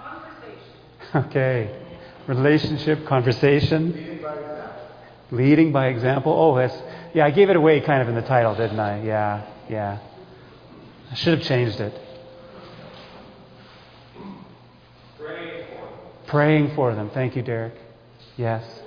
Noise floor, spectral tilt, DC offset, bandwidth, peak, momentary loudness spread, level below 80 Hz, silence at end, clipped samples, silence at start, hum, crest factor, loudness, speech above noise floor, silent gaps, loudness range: -49 dBFS; -8.5 dB/octave; under 0.1%; 5.2 kHz; -4 dBFS; 24 LU; -54 dBFS; 0 s; under 0.1%; 0 s; none; 20 dB; -21 LUFS; 29 dB; none; 13 LU